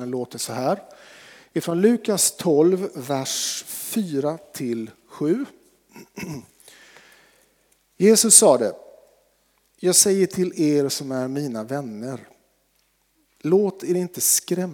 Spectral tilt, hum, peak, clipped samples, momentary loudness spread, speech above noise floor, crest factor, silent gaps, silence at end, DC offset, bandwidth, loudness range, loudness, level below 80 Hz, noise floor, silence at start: -3.5 dB/octave; none; 0 dBFS; under 0.1%; 16 LU; 45 dB; 22 dB; none; 0 s; under 0.1%; over 20 kHz; 11 LU; -20 LUFS; -72 dBFS; -66 dBFS; 0 s